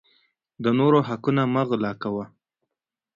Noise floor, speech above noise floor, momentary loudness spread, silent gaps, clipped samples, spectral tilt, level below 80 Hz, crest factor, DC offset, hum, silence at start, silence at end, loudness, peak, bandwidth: -86 dBFS; 64 dB; 11 LU; none; under 0.1%; -9 dB/octave; -64 dBFS; 18 dB; under 0.1%; none; 0.6 s; 0.9 s; -23 LUFS; -6 dBFS; 7.2 kHz